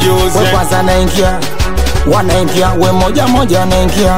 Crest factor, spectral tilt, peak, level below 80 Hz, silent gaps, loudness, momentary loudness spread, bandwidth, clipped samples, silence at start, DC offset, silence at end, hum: 12 dB; -5 dB/octave; 0 dBFS; -18 dBFS; none; -11 LUFS; 4 LU; 16.5 kHz; under 0.1%; 0 s; 10%; 0 s; none